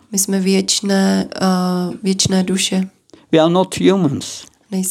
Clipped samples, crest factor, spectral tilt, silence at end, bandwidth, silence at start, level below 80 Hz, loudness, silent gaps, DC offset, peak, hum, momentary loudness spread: under 0.1%; 16 dB; -4.5 dB/octave; 0 s; 16 kHz; 0.1 s; -54 dBFS; -16 LUFS; none; under 0.1%; 0 dBFS; none; 9 LU